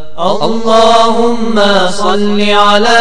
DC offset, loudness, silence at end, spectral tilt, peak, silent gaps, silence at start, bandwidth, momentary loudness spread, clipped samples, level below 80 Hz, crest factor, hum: 20%; -9 LUFS; 0 s; -4 dB/octave; 0 dBFS; none; 0 s; 11 kHz; 6 LU; 2%; -40 dBFS; 10 dB; none